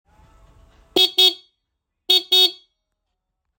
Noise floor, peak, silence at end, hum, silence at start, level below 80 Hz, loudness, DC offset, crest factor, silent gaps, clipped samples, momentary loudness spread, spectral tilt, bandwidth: -78 dBFS; -4 dBFS; 1.05 s; none; 0.95 s; -60 dBFS; -15 LUFS; under 0.1%; 20 dB; none; under 0.1%; 8 LU; -0.5 dB/octave; 17 kHz